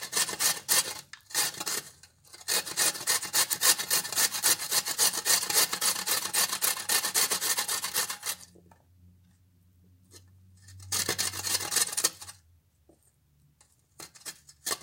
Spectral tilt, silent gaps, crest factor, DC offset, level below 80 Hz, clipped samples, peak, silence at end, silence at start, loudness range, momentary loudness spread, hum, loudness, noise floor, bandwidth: 1 dB/octave; none; 24 dB; under 0.1%; -72 dBFS; under 0.1%; -6 dBFS; 0 s; 0 s; 10 LU; 14 LU; none; -26 LUFS; -66 dBFS; 17 kHz